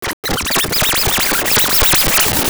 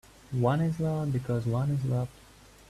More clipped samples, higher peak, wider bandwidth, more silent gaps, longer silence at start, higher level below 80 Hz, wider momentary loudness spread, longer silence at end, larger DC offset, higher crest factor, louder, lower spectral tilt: neither; first, 0 dBFS vs -14 dBFS; first, over 20 kHz vs 13 kHz; first, 0.13-0.23 s vs none; second, 0 s vs 0.3 s; first, -30 dBFS vs -54 dBFS; about the same, 6 LU vs 6 LU; second, 0 s vs 0.6 s; neither; about the same, 14 dB vs 16 dB; first, -12 LUFS vs -30 LUFS; second, -1.5 dB/octave vs -8.5 dB/octave